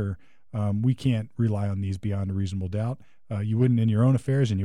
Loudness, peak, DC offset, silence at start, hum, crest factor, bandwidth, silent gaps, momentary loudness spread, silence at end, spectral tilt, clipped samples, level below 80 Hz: -26 LUFS; -12 dBFS; 0.4%; 0 s; none; 14 dB; 10.5 kHz; none; 11 LU; 0 s; -8.5 dB/octave; under 0.1%; -56 dBFS